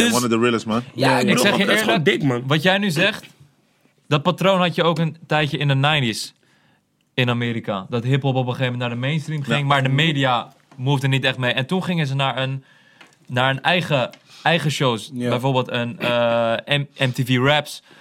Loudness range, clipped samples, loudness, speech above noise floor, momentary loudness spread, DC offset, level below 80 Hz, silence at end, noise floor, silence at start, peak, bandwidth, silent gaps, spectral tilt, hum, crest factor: 3 LU; under 0.1%; -20 LUFS; 43 dB; 8 LU; under 0.1%; -62 dBFS; 0.2 s; -62 dBFS; 0 s; -2 dBFS; 16.5 kHz; none; -5 dB/octave; none; 18 dB